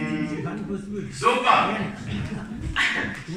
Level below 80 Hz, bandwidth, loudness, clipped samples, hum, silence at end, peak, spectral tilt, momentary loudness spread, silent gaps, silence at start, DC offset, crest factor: -44 dBFS; 13.5 kHz; -24 LUFS; under 0.1%; none; 0 s; -4 dBFS; -5 dB/octave; 13 LU; none; 0 s; under 0.1%; 20 dB